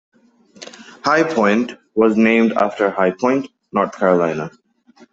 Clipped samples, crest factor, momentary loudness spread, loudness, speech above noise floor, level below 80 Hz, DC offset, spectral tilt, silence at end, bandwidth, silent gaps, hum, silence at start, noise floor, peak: under 0.1%; 16 dB; 17 LU; -17 LUFS; 34 dB; -60 dBFS; under 0.1%; -6 dB/octave; 0.65 s; 7.8 kHz; none; none; 0.6 s; -50 dBFS; -2 dBFS